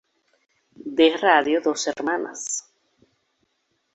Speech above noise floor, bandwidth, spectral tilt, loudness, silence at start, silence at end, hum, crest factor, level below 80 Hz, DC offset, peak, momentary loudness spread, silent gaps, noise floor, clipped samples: 51 dB; 8.2 kHz; -1.5 dB/octave; -21 LUFS; 0.85 s; 1.35 s; none; 22 dB; -70 dBFS; under 0.1%; -2 dBFS; 12 LU; none; -72 dBFS; under 0.1%